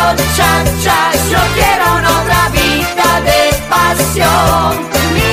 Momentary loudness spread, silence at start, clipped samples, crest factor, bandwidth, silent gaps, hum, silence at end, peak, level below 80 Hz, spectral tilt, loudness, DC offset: 2 LU; 0 s; under 0.1%; 10 dB; 15.5 kHz; none; none; 0 s; 0 dBFS; -24 dBFS; -3.5 dB/octave; -10 LUFS; under 0.1%